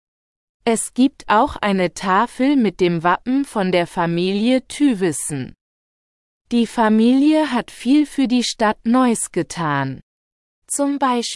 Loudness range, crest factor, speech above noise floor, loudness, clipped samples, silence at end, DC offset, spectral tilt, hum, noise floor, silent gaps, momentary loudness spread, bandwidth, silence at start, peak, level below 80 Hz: 3 LU; 16 dB; over 73 dB; -18 LUFS; under 0.1%; 0 s; under 0.1%; -4.5 dB/octave; none; under -90 dBFS; 5.61-6.45 s, 10.03-10.62 s; 7 LU; 12 kHz; 0.65 s; -2 dBFS; -50 dBFS